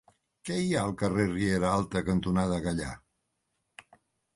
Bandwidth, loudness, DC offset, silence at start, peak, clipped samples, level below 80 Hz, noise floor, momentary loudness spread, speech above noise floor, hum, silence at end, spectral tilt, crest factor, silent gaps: 11.5 kHz; -29 LUFS; under 0.1%; 0.45 s; -12 dBFS; under 0.1%; -50 dBFS; -80 dBFS; 9 LU; 51 dB; none; 1.4 s; -6 dB/octave; 18 dB; none